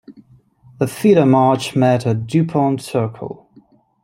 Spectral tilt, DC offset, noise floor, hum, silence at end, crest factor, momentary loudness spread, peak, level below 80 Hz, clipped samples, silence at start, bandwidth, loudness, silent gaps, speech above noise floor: -7 dB/octave; under 0.1%; -51 dBFS; none; 0.7 s; 16 dB; 14 LU; -2 dBFS; -58 dBFS; under 0.1%; 0.1 s; 16 kHz; -16 LUFS; none; 35 dB